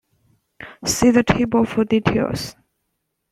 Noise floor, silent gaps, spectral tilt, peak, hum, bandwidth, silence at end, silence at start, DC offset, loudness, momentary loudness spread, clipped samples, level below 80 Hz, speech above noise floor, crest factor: -75 dBFS; none; -5 dB/octave; -2 dBFS; none; 14 kHz; 0.8 s; 0.6 s; under 0.1%; -18 LUFS; 17 LU; under 0.1%; -42 dBFS; 57 dB; 18 dB